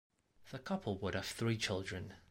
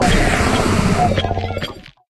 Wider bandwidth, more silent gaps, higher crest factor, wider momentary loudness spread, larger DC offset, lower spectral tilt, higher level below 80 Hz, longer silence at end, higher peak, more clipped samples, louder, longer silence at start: first, 16 kHz vs 14 kHz; neither; about the same, 18 dB vs 14 dB; about the same, 11 LU vs 10 LU; neither; about the same, -5 dB/octave vs -5 dB/octave; second, -64 dBFS vs -26 dBFS; second, 0.1 s vs 0.3 s; second, -24 dBFS vs -2 dBFS; neither; second, -40 LUFS vs -17 LUFS; first, 0.4 s vs 0 s